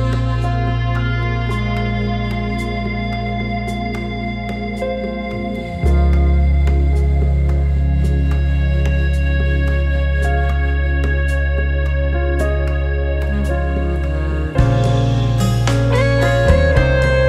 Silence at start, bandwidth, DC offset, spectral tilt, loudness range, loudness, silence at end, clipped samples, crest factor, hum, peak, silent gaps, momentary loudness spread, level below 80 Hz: 0 s; 10.5 kHz; under 0.1%; -7 dB/octave; 5 LU; -18 LUFS; 0 s; under 0.1%; 16 dB; none; 0 dBFS; none; 7 LU; -18 dBFS